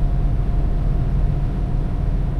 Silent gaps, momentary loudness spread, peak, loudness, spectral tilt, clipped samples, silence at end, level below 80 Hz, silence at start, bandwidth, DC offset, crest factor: none; 2 LU; -8 dBFS; -23 LUFS; -9.5 dB/octave; under 0.1%; 0 s; -20 dBFS; 0 s; 4.3 kHz; under 0.1%; 10 dB